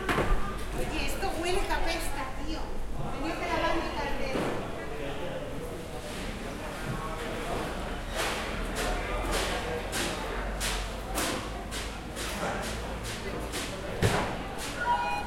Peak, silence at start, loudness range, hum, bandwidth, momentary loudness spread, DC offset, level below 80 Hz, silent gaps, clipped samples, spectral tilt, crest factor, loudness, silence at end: -12 dBFS; 0 s; 3 LU; none; 16.5 kHz; 8 LU; under 0.1%; -38 dBFS; none; under 0.1%; -4 dB/octave; 20 dB; -33 LUFS; 0 s